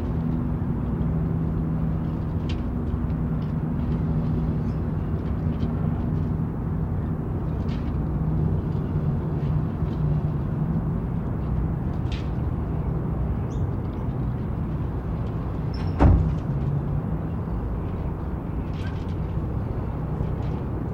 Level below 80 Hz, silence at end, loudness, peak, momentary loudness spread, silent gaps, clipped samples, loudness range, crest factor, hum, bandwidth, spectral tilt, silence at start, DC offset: -32 dBFS; 0 s; -27 LUFS; -6 dBFS; 4 LU; none; under 0.1%; 3 LU; 18 dB; none; 6 kHz; -10 dB/octave; 0 s; under 0.1%